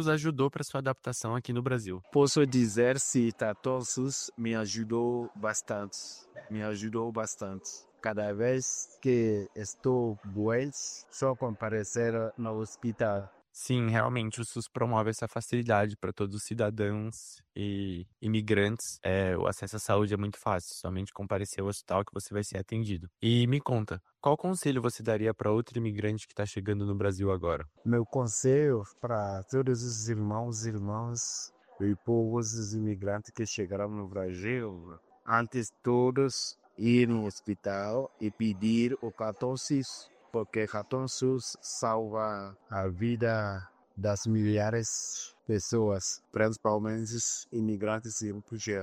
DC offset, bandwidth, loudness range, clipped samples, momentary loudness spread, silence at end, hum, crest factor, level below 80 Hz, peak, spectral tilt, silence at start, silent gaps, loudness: under 0.1%; 14 kHz; 4 LU; under 0.1%; 9 LU; 0 s; none; 20 dB; -64 dBFS; -10 dBFS; -5 dB/octave; 0 s; none; -31 LUFS